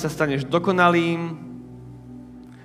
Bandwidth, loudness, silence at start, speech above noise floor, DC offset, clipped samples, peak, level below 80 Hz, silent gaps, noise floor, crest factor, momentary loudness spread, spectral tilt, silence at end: 15.5 kHz; -21 LUFS; 0 s; 21 dB; under 0.1%; under 0.1%; -2 dBFS; -54 dBFS; none; -41 dBFS; 22 dB; 24 LU; -6.5 dB/octave; 0 s